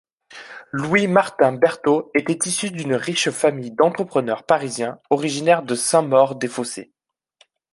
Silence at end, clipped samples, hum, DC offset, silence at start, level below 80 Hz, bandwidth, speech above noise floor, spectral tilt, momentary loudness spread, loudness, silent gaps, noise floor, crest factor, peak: 0.9 s; under 0.1%; none; under 0.1%; 0.3 s; -64 dBFS; 11.5 kHz; 40 dB; -4 dB/octave; 11 LU; -20 LUFS; none; -60 dBFS; 18 dB; -2 dBFS